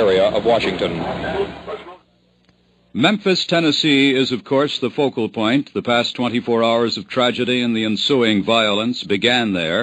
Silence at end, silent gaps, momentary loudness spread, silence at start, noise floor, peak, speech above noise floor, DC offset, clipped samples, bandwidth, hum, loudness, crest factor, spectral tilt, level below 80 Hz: 0 s; none; 8 LU; 0 s; -57 dBFS; 0 dBFS; 39 dB; under 0.1%; under 0.1%; 9.4 kHz; none; -17 LUFS; 18 dB; -5 dB/octave; -50 dBFS